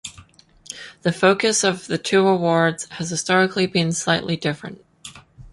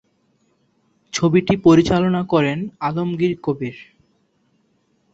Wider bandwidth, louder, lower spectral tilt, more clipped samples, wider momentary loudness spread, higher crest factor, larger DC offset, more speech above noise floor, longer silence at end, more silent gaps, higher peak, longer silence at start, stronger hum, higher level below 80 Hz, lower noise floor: first, 11.5 kHz vs 8 kHz; about the same, -20 LUFS vs -18 LUFS; second, -4 dB/octave vs -6.5 dB/octave; neither; first, 20 LU vs 12 LU; about the same, 20 dB vs 18 dB; neither; second, 30 dB vs 46 dB; second, 0.05 s vs 1.3 s; neither; about the same, -2 dBFS vs -2 dBFS; second, 0.05 s vs 1.15 s; neither; second, -56 dBFS vs -48 dBFS; second, -50 dBFS vs -64 dBFS